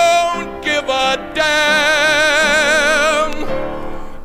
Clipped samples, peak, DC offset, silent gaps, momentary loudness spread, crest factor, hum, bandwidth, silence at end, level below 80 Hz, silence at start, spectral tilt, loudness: under 0.1%; -2 dBFS; under 0.1%; none; 11 LU; 14 dB; none; 16 kHz; 0 s; -32 dBFS; 0 s; -1.5 dB/octave; -14 LUFS